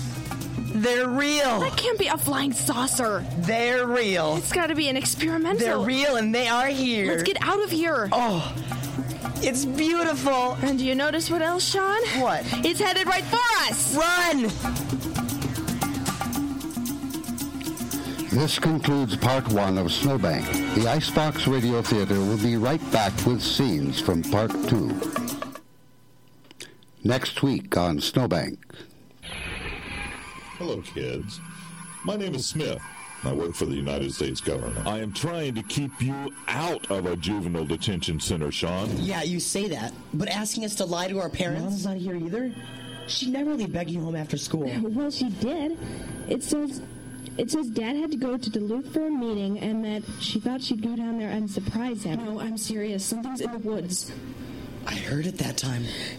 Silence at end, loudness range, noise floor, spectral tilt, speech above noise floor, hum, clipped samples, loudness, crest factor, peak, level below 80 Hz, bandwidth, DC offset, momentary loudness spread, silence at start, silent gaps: 0 s; 7 LU; -57 dBFS; -4.5 dB/octave; 32 dB; none; under 0.1%; -26 LUFS; 20 dB; -6 dBFS; -48 dBFS; 16.5 kHz; 0.1%; 10 LU; 0 s; none